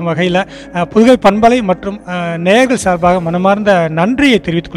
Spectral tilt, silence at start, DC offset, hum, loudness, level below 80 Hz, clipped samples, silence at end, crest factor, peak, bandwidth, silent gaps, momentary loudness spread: -5.5 dB/octave; 0 s; under 0.1%; none; -11 LUFS; -38 dBFS; 1%; 0 s; 12 dB; 0 dBFS; 13 kHz; none; 10 LU